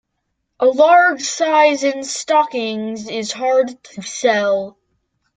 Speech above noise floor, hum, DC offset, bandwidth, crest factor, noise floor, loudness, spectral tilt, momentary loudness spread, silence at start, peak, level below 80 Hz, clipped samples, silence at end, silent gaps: 57 dB; none; under 0.1%; 9.4 kHz; 16 dB; -73 dBFS; -16 LUFS; -2.5 dB/octave; 13 LU; 0.6 s; -2 dBFS; -66 dBFS; under 0.1%; 0.65 s; none